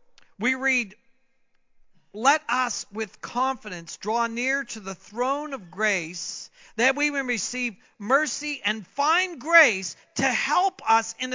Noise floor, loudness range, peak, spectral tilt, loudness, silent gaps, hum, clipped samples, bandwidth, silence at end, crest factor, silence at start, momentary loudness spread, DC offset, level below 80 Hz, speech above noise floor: -64 dBFS; 5 LU; -4 dBFS; -2 dB/octave; -24 LUFS; none; none; under 0.1%; 7.8 kHz; 0 s; 22 dB; 0.4 s; 12 LU; under 0.1%; -72 dBFS; 38 dB